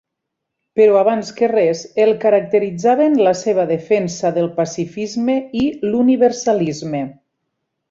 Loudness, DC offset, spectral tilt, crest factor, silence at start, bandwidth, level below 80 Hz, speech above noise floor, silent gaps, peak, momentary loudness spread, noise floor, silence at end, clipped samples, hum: -16 LUFS; under 0.1%; -6 dB/octave; 14 dB; 0.75 s; 7.8 kHz; -56 dBFS; 63 dB; none; -2 dBFS; 9 LU; -78 dBFS; 0.8 s; under 0.1%; none